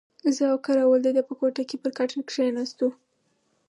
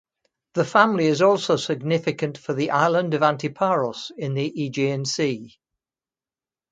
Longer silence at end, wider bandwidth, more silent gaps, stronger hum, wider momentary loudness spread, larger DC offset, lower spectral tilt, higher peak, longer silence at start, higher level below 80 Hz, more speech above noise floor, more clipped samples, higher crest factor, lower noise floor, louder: second, 0.75 s vs 1.25 s; first, 11 kHz vs 9.4 kHz; neither; neither; about the same, 8 LU vs 10 LU; neither; second, -3.5 dB/octave vs -5.5 dB/octave; second, -10 dBFS vs -2 dBFS; second, 0.25 s vs 0.55 s; second, -82 dBFS vs -68 dBFS; second, 46 dB vs over 68 dB; neither; second, 14 dB vs 22 dB; second, -70 dBFS vs under -90 dBFS; second, -25 LUFS vs -22 LUFS